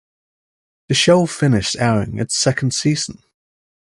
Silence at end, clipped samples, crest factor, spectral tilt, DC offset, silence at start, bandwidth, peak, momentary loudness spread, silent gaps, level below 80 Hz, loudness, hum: 0.75 s; under 0.1%; 16 dB; -4.5 dB/octave; under 0.1%; 0.9 s; 11.5 kHz; -2 dBFS; 7 LU; none; -46 dBFS; -17 LUFS; none